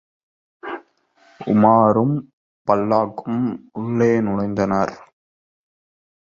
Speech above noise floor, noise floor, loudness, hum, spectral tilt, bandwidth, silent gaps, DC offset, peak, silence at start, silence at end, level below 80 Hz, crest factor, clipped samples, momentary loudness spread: 39 dB; -57 dBFS; -19 LUFS; none; -8.5 dB/octave; 7 kHz; 2.33-2.65 s; under 0.1%; -2 dBFS; 0.65 s; 1.3 s; -56 dBFS; 20 dB; under 0.1%; 19 LU